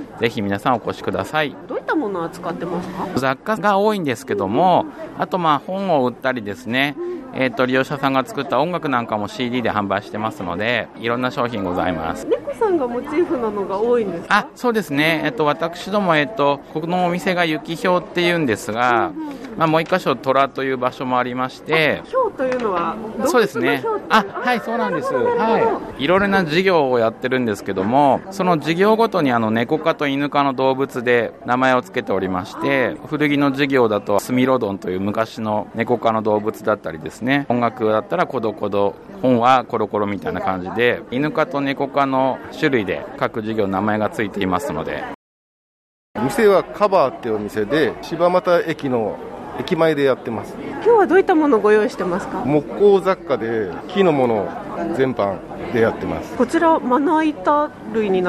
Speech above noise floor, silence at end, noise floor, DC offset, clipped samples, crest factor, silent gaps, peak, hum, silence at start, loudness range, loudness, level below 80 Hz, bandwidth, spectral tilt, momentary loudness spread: over 71 dB; 0 s; under -90 dBFS; under 0.1%; under 0.1%; 16 dB; 45.15-46.14 s; -2 dBFS; none; 0 s; 4 LU; -19 LUFS; -52 dBFS; 13.5 kHz; -6 dB/octave; 8 LU